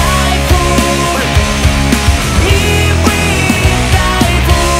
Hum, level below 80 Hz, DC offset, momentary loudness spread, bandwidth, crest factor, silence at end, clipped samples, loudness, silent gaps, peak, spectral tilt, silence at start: none; -16 dBFS; under 0.1%; 2 LU; 16.5 kHz; 10 dB; 0 s; 0.2%; -10 LUFS; none; 0 dBFS; -4.5 dB/octave; 0 s